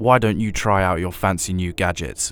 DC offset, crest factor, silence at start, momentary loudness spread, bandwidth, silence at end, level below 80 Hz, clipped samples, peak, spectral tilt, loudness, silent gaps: under 0.1%; 20 dB; 0 s; 6 LU; over 20 kHz; 0 s; -36 dBFS; under 0.1%; 0 dBFS; -5 dB/octave; -20 LUFS; none